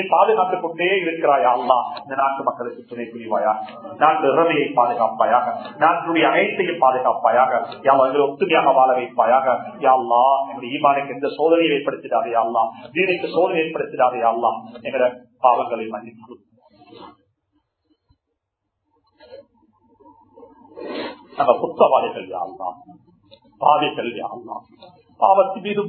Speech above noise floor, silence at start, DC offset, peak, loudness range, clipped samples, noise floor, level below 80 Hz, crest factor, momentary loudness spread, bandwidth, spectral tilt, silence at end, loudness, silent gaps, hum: 59 dB; 0 s; under 0.1%; 0 dBFS; 8 LU; under 0.1%; -78 dBFS; -70 dBFS; 20 dB; 14 LU; 4.5 kHz; -9 dB/octave; 0 s; -19 LUFS; none; none